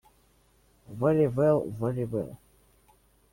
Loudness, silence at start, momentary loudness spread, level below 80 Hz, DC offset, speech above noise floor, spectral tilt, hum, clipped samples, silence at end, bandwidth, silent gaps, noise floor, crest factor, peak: -27 LUFS; 0.9 s; 13 LU; -60 dBFS; under 0.1%; 38 dB; -9.5 dB/octave; 60 Hz at -55 dBFS; under 0.1%; 0.95 s; 16.5 kHz; none; -64 dBFS; 18 dB; -12 dBFS